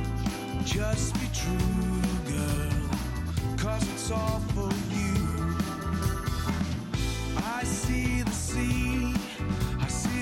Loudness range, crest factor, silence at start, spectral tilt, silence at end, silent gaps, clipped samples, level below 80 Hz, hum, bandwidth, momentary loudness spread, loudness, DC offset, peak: 1 LU; 12 dB; 0 s; -5 dB/octave; 0 s; none; under 0.1%; -36 dBFS; none; 16.5 kHz; 3 LU; -30 LUFS; under 0.1%; -16 dBFS